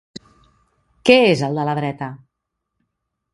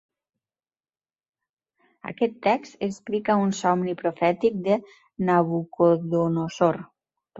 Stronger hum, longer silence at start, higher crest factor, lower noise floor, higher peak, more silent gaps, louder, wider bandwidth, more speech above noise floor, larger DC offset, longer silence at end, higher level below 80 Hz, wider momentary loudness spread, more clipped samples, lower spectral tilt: neither; second, 1.05 s vs 2.05 s; about the same, 20 dB vs 18 dB; second, -78 dBFS vs under -90 dBFS; first, 0 dBFS vs -8 dBFS; neither; first, -17 LUFS vs -24 LUFS; first, 11.5 kHz vs 8 kHz; second, 62 dB vs over 67 dB; neither; first, 1.15 s vs 0 s; first, -58 dBFS vs -66 dBFS; first, 16 LU vs 8 LU; neither; second, -5.5 dB/octave vs -7 dB/octave